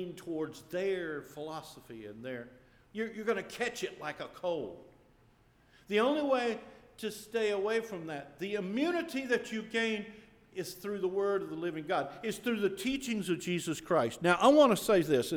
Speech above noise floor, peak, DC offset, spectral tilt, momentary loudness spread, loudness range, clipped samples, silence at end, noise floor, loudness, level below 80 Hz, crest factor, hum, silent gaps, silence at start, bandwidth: 32 dB; -10 dBFS; under 0.1%; -4.5 dB/octave; 15 LU; 9 LU; under 0.1%; 0 s; -65 dBFS; -33 LUFS; -68 dBFS; 22 dB; none; none; 0 s; over 20 kHz